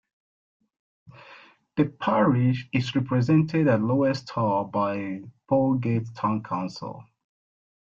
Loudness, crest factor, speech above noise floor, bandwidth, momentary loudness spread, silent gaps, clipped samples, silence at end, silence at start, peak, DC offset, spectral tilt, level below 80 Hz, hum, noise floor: -25 LUFS; 16 dB; 28 dB; 7.4 kHz; 12 LU; none; under 0.1%; 0.9 s; 1.3 s; -8 dBFS; under 0.1%; -8 dB/octave; -62 dBFS; none; -51 dBFS